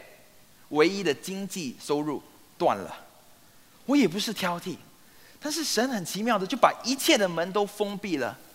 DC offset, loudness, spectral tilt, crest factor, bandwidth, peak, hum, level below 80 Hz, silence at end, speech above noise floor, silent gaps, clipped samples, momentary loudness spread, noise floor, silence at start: under 0.1%; -27 LUFS; -3.5 dB/octave; 26 dB; 16 kHz; -2 dBFS; none; -72 dBFS; 0.1 s; 28 dB; none; under 0.1%; 13 LU; -55 dBFS; 0 s